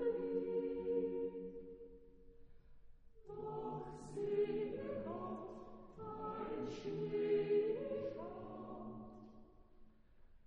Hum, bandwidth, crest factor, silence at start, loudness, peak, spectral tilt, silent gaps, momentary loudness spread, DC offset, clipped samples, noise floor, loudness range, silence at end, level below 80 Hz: none; 8.8 kHz; 16 dB; 0 s; -43 LUFS; -26 dBFS; -7.5 dB/octave; none; 17 LU; under 0.1%; under 0.1%; -63 dBFS; 5 LU; 0.05 s; -66 dBFS